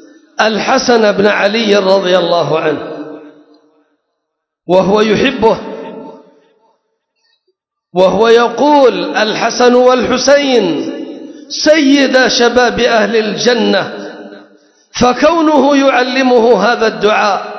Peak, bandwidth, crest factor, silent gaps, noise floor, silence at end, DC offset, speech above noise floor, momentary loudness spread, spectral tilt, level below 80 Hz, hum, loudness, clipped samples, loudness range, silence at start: 0 dBFS; 8 kHz; 12 dB; none; -73 dBFS; 0 s; under 0.1%; 63 dB; 16 LU; -4 dB/octave; -46 dBFS; none; -10 LUFS; 0.4%; 5 LU; 0.4 s